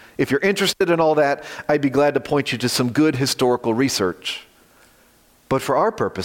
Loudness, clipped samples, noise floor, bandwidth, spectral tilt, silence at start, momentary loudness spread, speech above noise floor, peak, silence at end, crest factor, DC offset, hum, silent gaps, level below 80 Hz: -19 LUFS; under 0.1%; -55 dBFS; 17 kHz; -4.5 dB/octave; 0.2 s; 7 LU; 36 dB; -6 dBFS; 0 s; 14 dB; under 0.1%; none; none; -56 dBFS